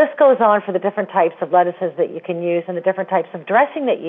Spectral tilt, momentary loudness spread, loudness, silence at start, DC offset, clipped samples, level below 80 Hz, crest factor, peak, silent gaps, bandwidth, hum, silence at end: -9.5 dB/octave; 8 LU; -18 LUFS; 0 s; under 0.1%; under 0.1%; -76 dBFS; 16 dB; -2 dBFS; none; 3.9 kHz; none; 0 s